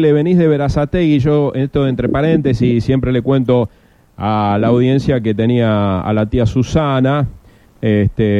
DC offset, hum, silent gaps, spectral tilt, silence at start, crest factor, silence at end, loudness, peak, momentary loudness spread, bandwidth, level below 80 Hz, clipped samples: under 0.1%; none; none; -8.5 dB/octave; 0 s; 12 dB; 0 s; -14 LUFS; -2 dBFS; 4 LU; 8 kHz; -34 dBFS; under 0.1%